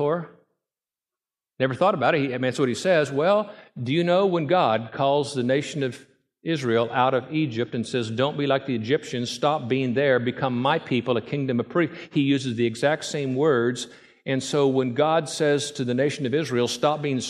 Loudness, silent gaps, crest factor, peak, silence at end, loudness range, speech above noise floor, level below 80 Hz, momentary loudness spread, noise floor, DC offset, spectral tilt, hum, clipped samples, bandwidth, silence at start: -24 LUFS; none; 18 dB; -6 dBFS; 0 s; 2 LU; over 67 dB; -70 dBFS; 7 LU; under -90 dBFS; under 0.1%; -5.5 dB/octave; none; under 0.1%; 13 kHz; 0 s